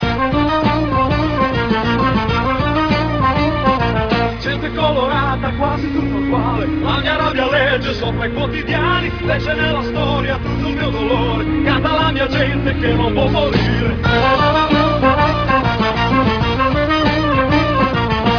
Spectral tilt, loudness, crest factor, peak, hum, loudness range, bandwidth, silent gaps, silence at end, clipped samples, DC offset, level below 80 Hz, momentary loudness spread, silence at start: -7 dB/octave; -16 LUFS; 14 dB; 0 dBFS; none; 3 LU; 5.4 kHz; none; 0 s; under 0.1%; under 0.1%; -28 dBFS; 5 LU; 0 s